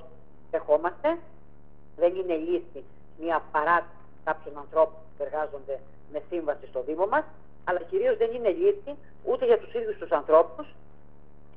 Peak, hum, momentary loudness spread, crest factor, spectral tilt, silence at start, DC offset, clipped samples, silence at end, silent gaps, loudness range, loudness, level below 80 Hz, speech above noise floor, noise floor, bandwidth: -6 dBFS; none; 14 LU; 22 dB; -3.5 dB/octave; 0 s; 0.8%; under 0.1%; 0.9 s; none; 4 LU; -27 LUFS; -58 dBFS; 28 dB; -55 dBFS; 4.5 kHz